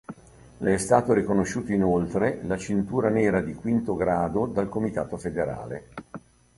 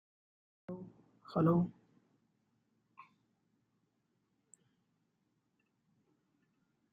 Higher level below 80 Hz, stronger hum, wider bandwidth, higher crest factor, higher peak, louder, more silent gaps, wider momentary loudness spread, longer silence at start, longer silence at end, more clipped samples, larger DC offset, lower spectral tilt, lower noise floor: first, -50 dBFS vs -78 dBFS; neither; first, 11.5 kHz vs 7.4 kHz; about the same, 20 dB vs 24 dB; first, -4 dBFS vs -18 dBFS; first, -25 LUFS vs -34 LUFS; neither; second, 15 LU vs 24 LU; second, 0.1 s vs 0.7 s; second, 0.4 s vs 5.25 s; neither; neither; second, -7 dB/octave vs -9.5 dB/octave; second, -46 dBFS vs -81 dBFS